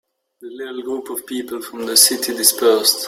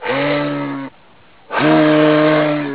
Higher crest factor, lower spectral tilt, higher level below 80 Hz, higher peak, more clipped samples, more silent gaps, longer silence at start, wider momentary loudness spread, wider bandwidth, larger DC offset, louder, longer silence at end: about the same, 18 dB vs 14 dB; second, 0 dB/octave vs -10 dB/octave; second, -66 dBFS vs -56 dBFS; about the same, 0 dBFS vs -2 dBFS; neither; neither; first, 0.4 s vs 0 s; first, 18 LU vs 14 LU; first, 17 kHz vs 4 kHz; second, under 0.1% vs 0.4%; about the same, -15 LUFS vs -14 LUFS; about the same, 0 s vs 0 s